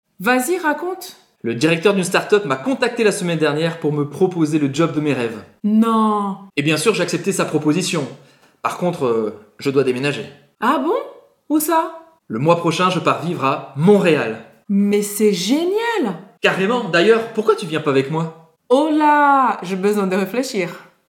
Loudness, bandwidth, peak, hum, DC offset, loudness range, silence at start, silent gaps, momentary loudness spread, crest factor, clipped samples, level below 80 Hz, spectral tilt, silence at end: -18 LUFS; 18 kHz; 0 dBFS; none; under 0.1%; 3 LU; 0.2 s; none; 11 LU; 18 dB; under 0.1%; -68 dBFS; -5 dB/octave; 0.25 s